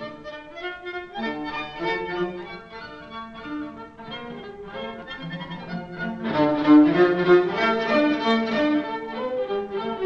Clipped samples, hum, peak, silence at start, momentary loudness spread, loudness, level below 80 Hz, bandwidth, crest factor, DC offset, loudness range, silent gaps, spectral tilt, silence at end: under 0.1%; none; -4 dBFS; 0 s; 19 LU; -23 LUFS; -56 dBFS; 6.6 kHz; 20 dB; under 0.1%; 15 LU; none; -7 dB/octave; 0 s